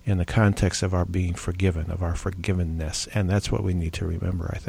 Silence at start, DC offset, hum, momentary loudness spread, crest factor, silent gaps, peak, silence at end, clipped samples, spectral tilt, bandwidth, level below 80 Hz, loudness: 0.05 s; under 0.1%; none; 7 LU; 16 dB; none; -8 dBFS; 0 s; under 0.1%; -6 dB/octave; 13.5 kHz; -36 dBFS; -26 LUFS